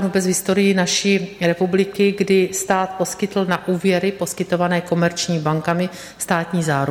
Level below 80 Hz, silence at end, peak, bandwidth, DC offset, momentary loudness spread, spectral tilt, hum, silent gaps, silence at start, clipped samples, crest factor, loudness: -56 dBFS; 0 s; -4 dBFS; 17 kHz; under 0.1%; 5 LU; -4.5 dB/octave; none; none; 0 s; under 0.1%; 14 dB; -19 LUFS